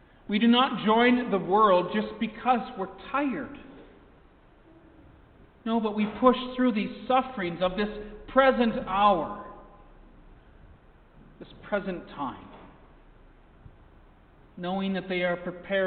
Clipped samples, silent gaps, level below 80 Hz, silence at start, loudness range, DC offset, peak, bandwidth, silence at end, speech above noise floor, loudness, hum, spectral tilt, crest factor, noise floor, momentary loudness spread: under 0.1%; none; -54 dBFS; 0.3 s; 14 LU; under 0.1%; -6 dBFS; 4.6 kHz; 0 s; 30 dB; -26 LUFS; none; -9.5 dB/octave; 22 dB; -56 dBFS; 15 LU